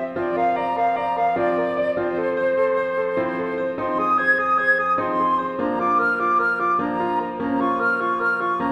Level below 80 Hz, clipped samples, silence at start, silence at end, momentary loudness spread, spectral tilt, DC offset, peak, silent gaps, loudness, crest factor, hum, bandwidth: -58 dBFS; under 0.1%; 0 s; 0 s; 6 LU; -7 dB/octave; under 0.1%; -8 dBFS; none; -21 LUFS; 14 dB; none; 9.8 kHz